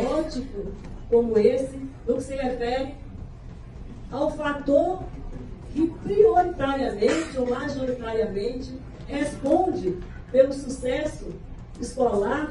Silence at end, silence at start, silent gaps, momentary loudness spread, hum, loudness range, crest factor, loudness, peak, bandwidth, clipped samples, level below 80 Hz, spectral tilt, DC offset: 0 s; 0 s; none; 19 LU; none; 4 LU; 20 dB; -25 LUFS; -6 dBFS; 11 kHz; under 0.1%; -40 dBFS; -6 dB/octave; under 0.1%